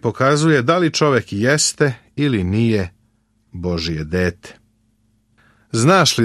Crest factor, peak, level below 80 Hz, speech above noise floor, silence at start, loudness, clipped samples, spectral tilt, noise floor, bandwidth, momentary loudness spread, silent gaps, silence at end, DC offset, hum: 16 dB; -2 dBFS; -44 dBFS; 45 dB; 0.05 s; -17 LUFS; under 0.1%; -4.5 dB/octave; -61 dBFS; 13 kHz; 10 LU; none; 0 s; under 0.1%; none